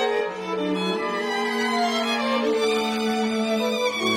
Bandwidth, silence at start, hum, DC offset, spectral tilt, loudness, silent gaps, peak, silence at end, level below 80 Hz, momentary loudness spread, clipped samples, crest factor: 16.5 kHz; 0 s; none; under 0.1%; -4 dB/octave; -23 LUFS; none; -10 dBFS; 0 s; -66 dBFS; 3 LU; under 0.1%; 14 dB